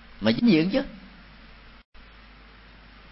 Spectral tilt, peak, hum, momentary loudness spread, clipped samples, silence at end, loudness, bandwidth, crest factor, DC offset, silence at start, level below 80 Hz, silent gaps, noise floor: -10 dB/octave; -8 dBFS; none; 19 LU; under 0.1%; 2.15 s; -23 LUFS; 5.8 kHz; 20 dB; under 0.1%; 0.2 s; -50 dBFS; none; -49 dBFS